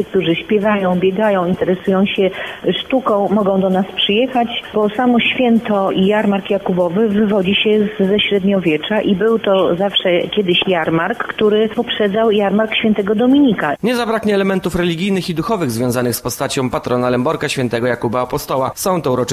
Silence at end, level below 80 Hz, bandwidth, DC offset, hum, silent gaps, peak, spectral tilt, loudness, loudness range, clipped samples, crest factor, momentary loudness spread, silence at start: 0 s; -46 dBFS; 15.5 kHz; under 0.1%; none; none; -4 dBFS; -5.5 dB/octave; -15 LUFS; 3 LU; under 0.1%; 12 dB; 5 LU; 0 s